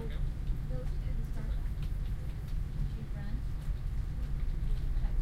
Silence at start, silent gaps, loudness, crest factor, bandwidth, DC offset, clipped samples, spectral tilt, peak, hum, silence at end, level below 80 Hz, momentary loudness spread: 0 s; none; -39 LUFS; 14 dB; 5.8 kHz; under 0.1%; under 0.1%; -7.5 dB/octave; -20 dBFS; none; 0 s; -34 dBFS; 2 LU